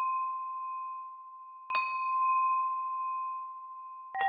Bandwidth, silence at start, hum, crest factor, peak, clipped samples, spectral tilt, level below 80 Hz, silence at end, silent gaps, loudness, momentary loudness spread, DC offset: 4.9 kHz; 0 s; none; 16 dB; -18 dBFS; under 0.1%; -2 dB/octave; under -90 dBFS; 0 s; none; -33 LUFS; 17 LU; under 0.1%